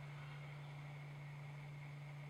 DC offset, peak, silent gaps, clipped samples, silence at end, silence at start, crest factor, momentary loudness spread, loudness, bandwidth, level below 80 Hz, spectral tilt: under 0.1%; -42 dBFS; none; under 0.1%; 0 s; 0 s; 10 dB; 1 LU; -52 LUFS; 12.5 kHz; -78 dBFS; -6.5 dB/octave